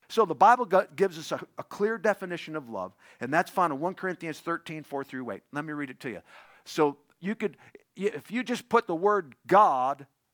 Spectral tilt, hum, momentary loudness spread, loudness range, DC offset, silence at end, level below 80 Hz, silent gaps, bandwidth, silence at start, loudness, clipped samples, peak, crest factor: -5.5 dB/octave; none; 16 LU; 7 LU; under 0.1%; 0.3 s; -78 dBFS; none; over 20 kHz; 0.1 s; -28 LUFS; under 0.1%; -6 dBFS; 22 dB